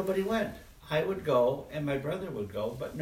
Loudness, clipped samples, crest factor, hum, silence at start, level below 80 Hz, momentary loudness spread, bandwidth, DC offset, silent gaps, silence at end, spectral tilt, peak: -32 LUFS; under 0.1%; 16 dB; none; 0 s; -56 dBFS; 9 LU; 16 kHz; under 0.1%; none; 0 s; -6.5 dB/octave; -16 dBFS